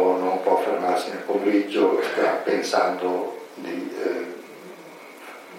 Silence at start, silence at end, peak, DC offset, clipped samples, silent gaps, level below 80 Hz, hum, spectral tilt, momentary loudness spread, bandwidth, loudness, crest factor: 0 s; 0 s; -6 dBFS; under 0.1%; under 0.1%; none; -86 dBFS; none; -4.5 dB/octave; 20 LU; 16.5 kHz; -23 LUFS; 18 dB